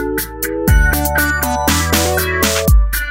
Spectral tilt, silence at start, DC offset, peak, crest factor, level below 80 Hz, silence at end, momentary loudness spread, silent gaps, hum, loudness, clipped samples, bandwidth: -4 dB/octave; 0 s; under 0.1%; 0 dBFS; 14 dB; -18 dBFS; 0 s; 6 LU; none; none; -14 LUFS; under 0.1%; 16.5 kHz